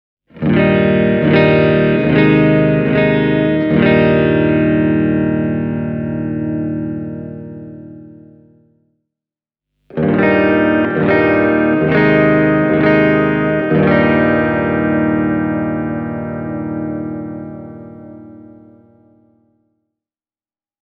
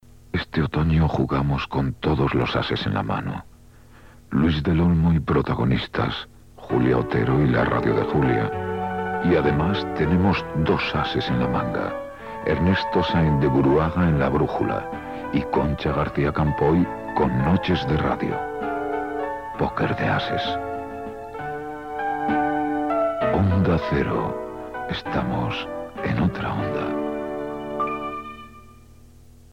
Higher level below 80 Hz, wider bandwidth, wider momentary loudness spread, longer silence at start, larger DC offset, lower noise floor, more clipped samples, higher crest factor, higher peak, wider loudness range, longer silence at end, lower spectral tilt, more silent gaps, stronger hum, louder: about the same, -40 dBFS vs -38 dBFS; second, 5.2 kHz vs 9.2 kHz; first, 15 LU vs 10 LU; about the same, 0.35 s vs 0.35 s; second, under 0.1% vs 0.2%; first, under -90 dBFS vs -49 dBFS; neither; about the same, 14 dB vs 16 dB; first, 0 dBFS vs -8 dBFS; first, 14 LU vs 5 LU; first, 2.35 s vs 0.85 s; first, -10 dB/octave vs -8 dB/octave; neither; first, 50 Hz at -50 dBFS vs none; first, -14 LUFS vs -23 LUFS